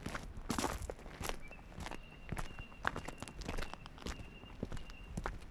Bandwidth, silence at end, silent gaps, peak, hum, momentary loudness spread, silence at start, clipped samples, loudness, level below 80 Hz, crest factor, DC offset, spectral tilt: 16.5 kHz; 0 s; none; -14 dBFS; none; 10 LU; 0 s; under 0.1%; -45 LUFS; -48 dBFS; 30 dB; under 0.1%; -4 dB/octave